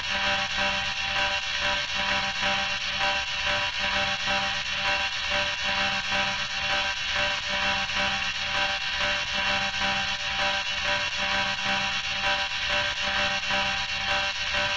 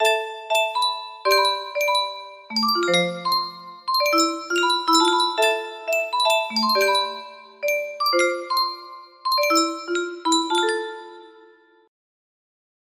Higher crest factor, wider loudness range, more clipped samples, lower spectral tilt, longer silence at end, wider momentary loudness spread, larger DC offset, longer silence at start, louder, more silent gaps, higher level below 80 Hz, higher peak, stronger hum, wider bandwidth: second, 14 dB vs 20 dB; second, 0 LU vs 4 LU; neither; about the same, -1.5 dB/octave vs -2 dB/octave; second, 0 s vs 1.55 s; second, 1 LU vs 10 LU; first, 0.2% vs under 0.1%; about the same, 0 s vs 0 s; second, -25 LUFS vs -21 LUFS; neither; first, -48 dBFS vs -74 dBFS; second, -12 dBFS vs -4 dBFS; neither; second, 12 kHz vs 15.5 kHz